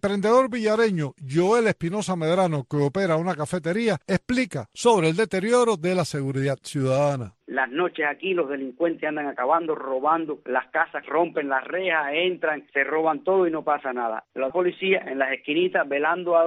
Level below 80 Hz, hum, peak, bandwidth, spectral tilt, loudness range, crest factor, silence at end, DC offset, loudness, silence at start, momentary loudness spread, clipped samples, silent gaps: -62 dBFS; none; -6 dBFS; 12.5 kHz; -5.5 dB/octave; 2 LU; 16 dB; 0 s; under 0.1%; -24 LUFS; 0.05 s; 7 LU; under 0.1%; none